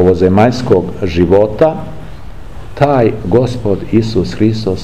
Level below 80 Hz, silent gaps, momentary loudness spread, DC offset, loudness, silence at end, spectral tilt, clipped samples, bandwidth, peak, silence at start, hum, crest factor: -32 dBFS; none; 18 LU; 4%; -12 LUFS; 0 s; -8 dB/octave; 0.2%; 12.5 kHz; 0 dBFS; 0 s; none; 12 dB